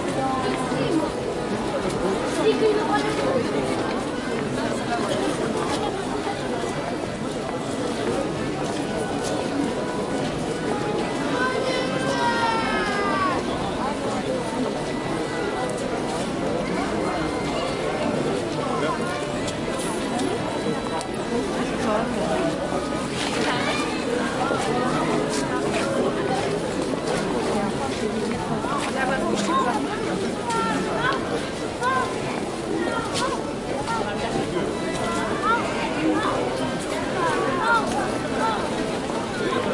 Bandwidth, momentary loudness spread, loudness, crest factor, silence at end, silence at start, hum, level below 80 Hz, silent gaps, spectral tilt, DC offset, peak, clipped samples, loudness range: 11.5 kHz; 4 LU; -24 LUFS; 16 dB; 0 s; 0 s; none; -46 dBFS; none; -4.5 dB/octave; under 0.1%; -8 dBFS; under 0.1%; 3 LU